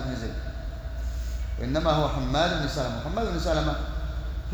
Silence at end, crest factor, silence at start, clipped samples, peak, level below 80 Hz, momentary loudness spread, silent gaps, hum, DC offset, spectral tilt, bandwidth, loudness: 0 s; 16 dB; 0 s; under 0.1%; -10 dBFS; -32 dBFS; 10 LU; none; none; under 0.1%; -6 dB/octave; over 20 kHz; -29 LUFS